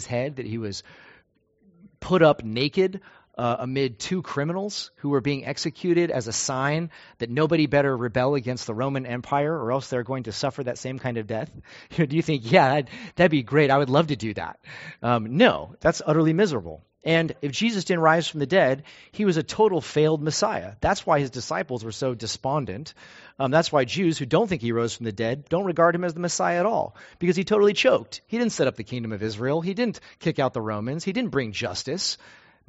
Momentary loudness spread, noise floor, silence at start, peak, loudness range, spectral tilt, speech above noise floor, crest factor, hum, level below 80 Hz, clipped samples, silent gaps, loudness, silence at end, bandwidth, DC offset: 11 LU; -63 dBFS; 0 s; -2 dBFS; 5 LU; -4.5 dB/octave; 39 dB; 22 dB; none; -54 dBFS; under 0.1%; none; -24 LUFS; 0.55 s; 8 kHz; under 0.1%